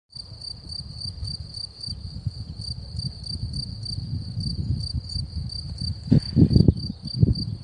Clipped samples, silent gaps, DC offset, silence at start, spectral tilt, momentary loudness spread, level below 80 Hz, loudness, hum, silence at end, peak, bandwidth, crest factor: under 0.1%; none; under 0.1%; 0.15 s; -7.5 dB/octave; 15 LU; -36 dBFS; -26 LUFS; none; 0 s; -2 dBFS; 10 kHz; 24 dB